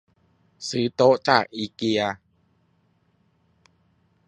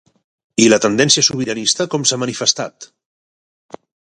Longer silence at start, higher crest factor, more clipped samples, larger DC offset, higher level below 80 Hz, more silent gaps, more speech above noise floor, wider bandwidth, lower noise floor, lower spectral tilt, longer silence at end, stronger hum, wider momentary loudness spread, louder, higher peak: about the same, 0.6 s vs 0.6 s; first, 26 dB vs 18 dB; neither; neither; second, -66 dBFS vs -58 dBFS; neither; second, 44 dB vs over 74 dB; about the same, 10.5 kHz vs 11.5 kHz; second, -66 dBFS vs under -90 dBFS; first, -4.5 dB/octave vs -2.5 dB/octave; first, 2.15 s vs 1.3 s; neither; first, 13 LU vs 9 LU; second, -22 LUFS vs -14 LUFS; about the same, 0 dBFS vs 0 dBFS